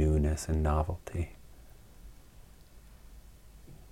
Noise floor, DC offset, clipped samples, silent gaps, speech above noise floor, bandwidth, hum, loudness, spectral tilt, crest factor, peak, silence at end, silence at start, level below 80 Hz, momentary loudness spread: -54 dBFS; under 0.1%; under 0.1%; none; 22 dB; 13.5 kHz; none; -32 LUFS; -7 dB/octave; 18 dB; -16 dBFS; 0.15 s; 0 s; -38 dBFS; 26 LU